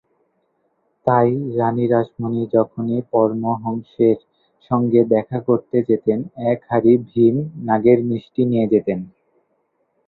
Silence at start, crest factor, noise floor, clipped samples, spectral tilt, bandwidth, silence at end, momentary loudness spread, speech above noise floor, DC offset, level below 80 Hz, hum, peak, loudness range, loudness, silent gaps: 1.05 s; 18 dB; -67 dBFS; under 0.1%; -12 dB/octave; 4.2 kHz; 1 s; 8 LU; 50 dB; under 0.1%; -58 dBFS; none; 0 dBFS; 2 LU; -19 LUFS; none